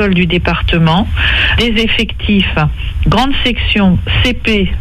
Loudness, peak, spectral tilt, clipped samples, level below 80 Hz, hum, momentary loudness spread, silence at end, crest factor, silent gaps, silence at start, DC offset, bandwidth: -12 LUFS; 0 dBFS; -6 dB/octave; under 0.1%; -18 dBFS; none; 3 LU; 0 s; 10 dB; none; 0 s; under 0.1%; 13.5 kHz